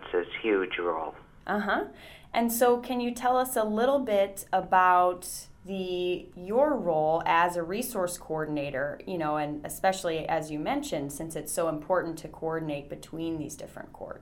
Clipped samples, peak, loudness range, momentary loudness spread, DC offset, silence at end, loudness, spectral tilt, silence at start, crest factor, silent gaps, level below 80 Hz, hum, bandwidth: under 0.1%; -10 dBFS; 6 LU; 13 LU; under 0.1%; 0 s; -28 LUFS; -4.5 dB/octave; 0 s; 20 dB; none; -56 dBFS; none; 19.5 kHz